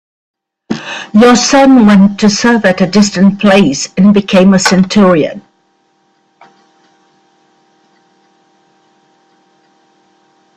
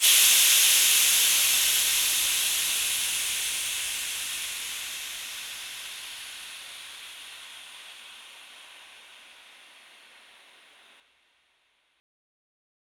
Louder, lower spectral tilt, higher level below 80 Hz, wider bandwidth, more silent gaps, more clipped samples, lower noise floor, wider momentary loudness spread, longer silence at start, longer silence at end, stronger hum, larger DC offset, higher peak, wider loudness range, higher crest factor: first, -8 LUFS vs -21 LUFS; first, -5 dB/octave vs 4 dB/octave; first, -46 dBFS vs -66 dBFS; second, 10 kHz vs over 20 kHz; neither; neither; second, -56 dBFS vs -70 dBFS; second, 13 LU vs 25 LU; first, 0.7 s vs 0 s; first, 5.15 s vs 4.05 s; neither; neither; first, 0 dBFS vs -6 dBFS; second, 7 LU vs 24 LU; second, 10 dB vs 22 dB